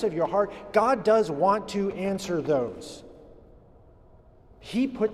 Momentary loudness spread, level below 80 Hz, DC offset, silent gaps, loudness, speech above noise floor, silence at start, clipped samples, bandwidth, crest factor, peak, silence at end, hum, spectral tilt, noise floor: 12 LU; -56 dBFS; under 0.1%; none; -26 LUFS; 28 dB; 0 s; under 0.1%; 13.5 kHz; 20 dB; -8 dBFS; 0 s; none; -6 dB/octave; -54 dBFS